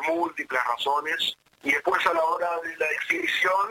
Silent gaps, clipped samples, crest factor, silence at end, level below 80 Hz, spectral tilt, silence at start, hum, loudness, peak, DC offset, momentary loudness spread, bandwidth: none; under 0.1%; 18 dB; 0 s; -70 dBFS; -2 dB/octave; 0 s; none; -25 LUFS; -8 dBFS; under 0.1%; 5 LU; 17 kHz